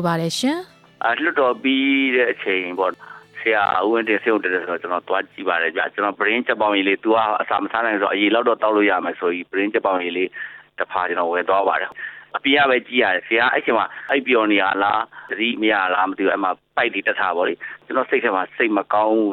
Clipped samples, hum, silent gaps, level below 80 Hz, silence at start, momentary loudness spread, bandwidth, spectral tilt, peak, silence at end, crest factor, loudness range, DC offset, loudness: under 0.1%; none; none; -66 dBFS; 0 s; 7 LU; 14 kHz; -4.5 dB/octave; -4 dBFS; 0 s; 16 dB; 2 LU; under 0.1%; -19 LUFS